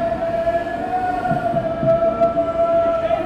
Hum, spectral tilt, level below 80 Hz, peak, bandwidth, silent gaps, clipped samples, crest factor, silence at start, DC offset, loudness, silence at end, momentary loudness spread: none; -8 dB/octave; -42 dBFS; -6 dBFS; 8.2 kHz; none; under 0.1%; 14 dB; 0 s; under 0.1%; -19 LUFS; 0 s; 4 LU